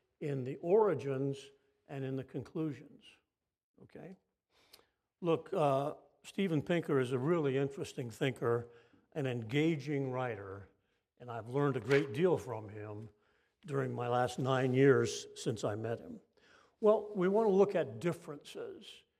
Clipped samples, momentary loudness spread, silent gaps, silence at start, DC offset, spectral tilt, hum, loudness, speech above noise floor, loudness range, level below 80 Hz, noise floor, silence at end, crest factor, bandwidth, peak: under 0.1%; 18 LU; 3.63-3.74 s; 0.2 s; under 0.1%; -6.5 dB/octave; none; -34 LUFS; 33 dB; 9 LU; -78 dBFS; -67 dBFS; 0.2 s; 20 dB; 13.5 kHz; -14 dBFS